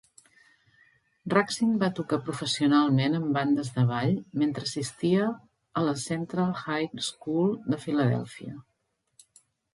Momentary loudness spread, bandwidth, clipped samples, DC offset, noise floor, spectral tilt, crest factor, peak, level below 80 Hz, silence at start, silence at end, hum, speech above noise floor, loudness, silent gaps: 9 LU; 11.5 kHz; under 0.1%; under 0.1%; -77 dBFS; -6 dB/octave; 22 dB; -6 dBFS; -68 dBFS; 1.25 s; 1.15 s; none; 50 dB; -27 LUFS; none